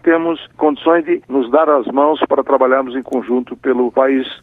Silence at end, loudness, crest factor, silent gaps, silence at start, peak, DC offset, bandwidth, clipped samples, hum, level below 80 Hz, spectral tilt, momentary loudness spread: 0.05 s; -15 LUFS; 14 dB; none; 0.05 s; 0 dBFS; under 0.1%; 4 kHz; under 0.1%; none; -58 dBFS; -7 dB/octave; 6 LU